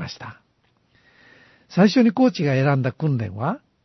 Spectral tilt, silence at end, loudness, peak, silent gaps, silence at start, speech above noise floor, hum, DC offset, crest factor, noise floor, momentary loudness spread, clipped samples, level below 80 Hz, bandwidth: -7.5 dB/octave; 0.25 s; -20 LUFS; -4 dBFS; none; 0 s; 45 dB; none; under 0.1%; 18 dB; -65 dBFS; 16 LU; under 0.1%; -64 dBFS; 6.2 kHz